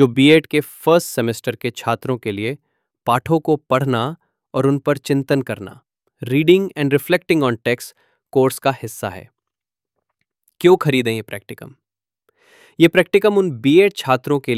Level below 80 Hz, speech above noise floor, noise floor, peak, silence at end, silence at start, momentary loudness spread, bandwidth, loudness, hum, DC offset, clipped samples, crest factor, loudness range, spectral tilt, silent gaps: -60 dBFS; 68 dB; -85 dBFS; 0 dBFS; 0 s; 0 s; 15 LU; 16 kHz; -17 LUFS; none; under 0.1%; under 0.1%; 18 dB; 4 LU; -6 dB/octave; none